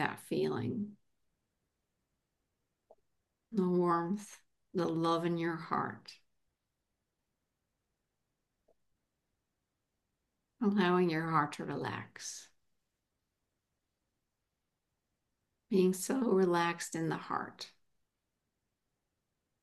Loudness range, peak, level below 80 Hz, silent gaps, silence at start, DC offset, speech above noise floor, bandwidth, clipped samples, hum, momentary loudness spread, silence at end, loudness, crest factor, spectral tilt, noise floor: 10 LU; -16 dBFS; -80 dBFS; none; 0 s; under 0.1%; 53 dB; 12.5 kHz; under 0.1%; none; 15 LU; 1.95 s; -34 LUFS; 22 dB; -5.5 dB/octave; -86 dBFS